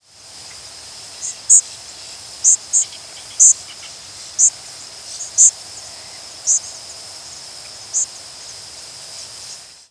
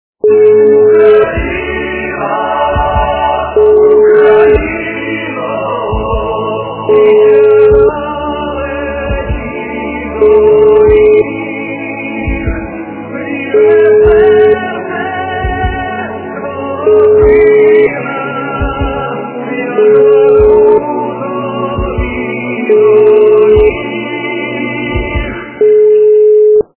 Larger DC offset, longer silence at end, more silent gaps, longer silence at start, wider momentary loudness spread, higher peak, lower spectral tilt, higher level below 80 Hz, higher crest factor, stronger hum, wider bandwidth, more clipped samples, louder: neither; first, 0.35 s vs 0.15 s; neither; first, 0.4 s vs 0.25 s; first, 22 LU vs 12 LU; about the same, 0 dBFS vs 0 dBFS; second, 2.5 dB/octave vs -10.5 dB/octave; second, -62 dBFS vs -26 dBFS; first, 20 dB vs 8 dB; neither; first, 11 kHz vs 3.3 kHz; second, under 0.1% vs 0.6%; second, -14 LUFS vs -9 LUFS